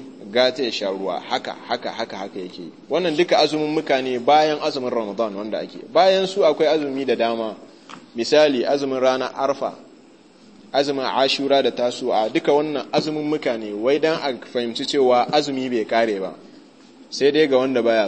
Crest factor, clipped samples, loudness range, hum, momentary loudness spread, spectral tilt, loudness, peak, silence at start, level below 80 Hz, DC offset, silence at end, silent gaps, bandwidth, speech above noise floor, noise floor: 18 dB; under 0.1%; 3 LU; none; 11 LU; -4.5 dB/octave; -20 LUFS; -2 dBFS; 0 s; -74 dBFS; 0.1%; 0 s; none; 8.8 kHz; 29 dB; -49 dBFS